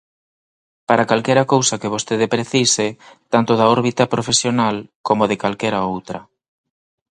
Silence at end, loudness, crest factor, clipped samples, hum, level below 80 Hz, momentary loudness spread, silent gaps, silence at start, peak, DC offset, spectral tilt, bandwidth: 0.9 s; -17 LUFS; 18 dB; under 0.1%; none; -58 dBFS; 10 LU; 4.95-5.04 s; 0.9 s; 0 dBFS; under 0.1%; -4 dB/octave; 11 kHz